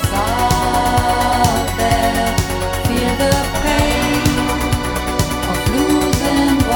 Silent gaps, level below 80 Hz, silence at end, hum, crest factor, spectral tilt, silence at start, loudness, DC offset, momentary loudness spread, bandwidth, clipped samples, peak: none; -26 dBFS; 0 s; none; 16 dB; -4.5 dB/octave; 0 s; -16 LUFS; 0.1%; 4 LU; 19 kHz; under 0.1%; 0 dBFS